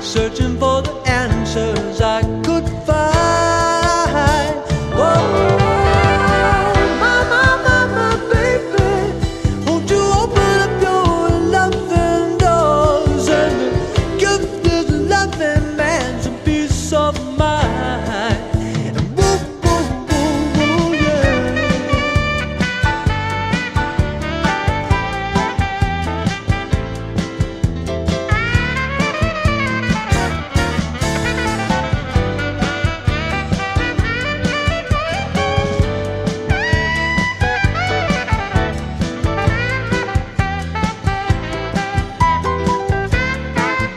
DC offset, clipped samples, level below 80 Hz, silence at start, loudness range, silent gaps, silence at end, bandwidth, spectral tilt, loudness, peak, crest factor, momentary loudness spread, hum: under 0.1%; under 0.1%; -26 dBFS; 0 s; 5 LU; none; 0 s; 13.5 kHz; -5.5 dB/octave; -16 LUFS; 0 dBFS; 16 dB; 6 LU; none